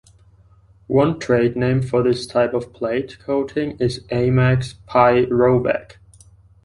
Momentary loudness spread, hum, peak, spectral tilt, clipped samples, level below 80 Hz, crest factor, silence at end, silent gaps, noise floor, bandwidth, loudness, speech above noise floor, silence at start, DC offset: 8 LU; none; -2 dBFS; -7.5 dB/octave; under 0.1%; -46 dBFS; 18 dB; 0.8 s; none; -51 dBFS; 11 kHz; -19 LUFS; 33 dB; 0.9 s; under 0.1%